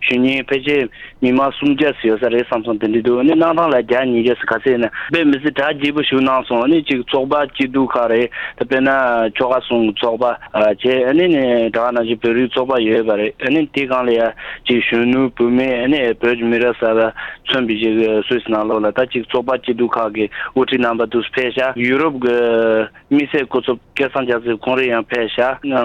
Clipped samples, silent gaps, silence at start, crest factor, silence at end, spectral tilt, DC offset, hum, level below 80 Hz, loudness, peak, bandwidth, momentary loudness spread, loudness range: under 0.1%; none; 0 s; 14 dB; 0 s; -7 dB/octave; under 0.1%; none; -48 dBFS; -16 LUFS; -2 dBFS; 7 kHz; 5 LU; 2 LU